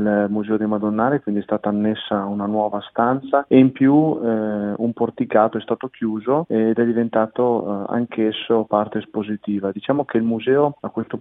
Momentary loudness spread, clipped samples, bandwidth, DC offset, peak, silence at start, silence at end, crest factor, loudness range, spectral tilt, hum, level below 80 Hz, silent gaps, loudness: 8 LU; under 0.1%; 3.9 kHz; under 0.1%; 0 dBFS; 0 s; 0 s; 18 dB; 3 LU; -10 dB/octave; none; -62 dBFS; none; -20 LUFS